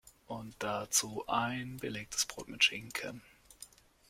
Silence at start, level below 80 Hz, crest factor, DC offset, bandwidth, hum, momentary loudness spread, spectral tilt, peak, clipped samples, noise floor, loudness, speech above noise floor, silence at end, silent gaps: 0.05 s; -66 dBFS; 24 dB; under 0.1%; 16.5 kHz; none; 23 LU; -1.5 dB/octave; -14 dBFS; under 0.1%; -57 dBFS; -34 LUFS; 21 dB; 0.45 s; none